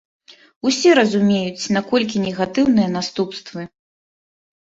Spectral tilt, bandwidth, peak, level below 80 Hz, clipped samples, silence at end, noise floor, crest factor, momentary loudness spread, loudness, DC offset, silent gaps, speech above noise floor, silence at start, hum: -5 dB/octave; 8 kHz; -2 dBFS; -58 dBFS; under 0.1%; 1 s; under -90 dBFS; 18 dB; 15 LU; -18 LUFS; under 0.1%; none; over 72 dB; 0.65 s; none